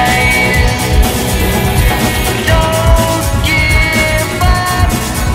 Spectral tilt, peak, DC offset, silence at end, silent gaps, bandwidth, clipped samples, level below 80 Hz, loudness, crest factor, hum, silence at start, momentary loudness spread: -4.5 dB/octave; 0 dBFS; under 0.1%; 0 s; none; 16.5 kHz; 0.3%; -16 dBFS; -11 LUFS; 10 dB; none; 0 s; 4 LU